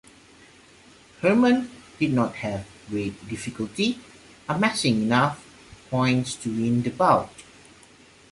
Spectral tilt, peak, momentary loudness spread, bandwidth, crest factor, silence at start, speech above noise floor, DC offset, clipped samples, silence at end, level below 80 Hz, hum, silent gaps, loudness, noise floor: -5.5 dB/octave; -6 dBFS; 13 LU; 11.5 kHz; 20 dB; 1.2 s; 29 dB; under 0.1%; under 0.1%; 0.9 s; -56 dBFS; none; none; -24 LUFS; -52 dBFS